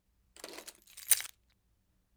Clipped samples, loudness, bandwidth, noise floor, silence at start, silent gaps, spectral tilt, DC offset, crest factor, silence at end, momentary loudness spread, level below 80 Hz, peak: under 0.1%; -29 LUFS; over 20 kHz; -74 dBFS; 0.45 s; none; 2 dB/octave; under 0.1%; 34 dB; 0.9 s; 21 LU; -74 dBFS; -6 dBFS